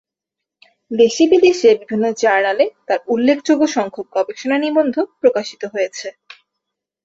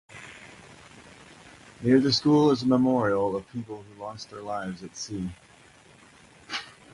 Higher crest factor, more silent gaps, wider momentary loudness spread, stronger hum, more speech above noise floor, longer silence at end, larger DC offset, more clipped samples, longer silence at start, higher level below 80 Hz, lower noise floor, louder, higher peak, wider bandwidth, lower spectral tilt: about the same, 16 dB vs 20 dB; neither; second, 11 LU vs 21 LU; neither; first, 67 dB vs 29 dB; first, 0.95 s vs 0.25 s; neither; neither; first, 0.9 s vs 0.15 s; second, -64 dBFS vs -58 dBFS; first, -83 dBFS vs -54 dBFS; first, -16 LUFS vs -25 LUFS; first, -2 dBFS vs -8 dBFS; second, 7.8 kHz vs 11.5 kHz; second, -4 dB/octave vs -5.5 dB/octave